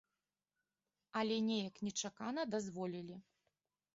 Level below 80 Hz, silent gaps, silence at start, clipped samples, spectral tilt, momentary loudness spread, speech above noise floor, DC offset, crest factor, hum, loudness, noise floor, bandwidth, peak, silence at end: -82 dBFS; none; 1.15 s; under 0.1%; -4 dB/octave; 11 LU; over 49 dB; under 0.1%; 16 dB; 50 Hz at -70 dBFS; -41 LUFS; under -90 dBFS; 7.6 kHz; -28 dBFS; 0.75 s